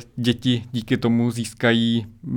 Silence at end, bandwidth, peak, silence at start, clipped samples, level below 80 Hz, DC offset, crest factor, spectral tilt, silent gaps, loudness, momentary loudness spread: 0 s; 16 kHz; -4 dBFS; 0 s; under 0.1%; -52 dBFS; under 0.1%; 18 dB; -6 dB/octave; none; -22 LUFS; 6 LU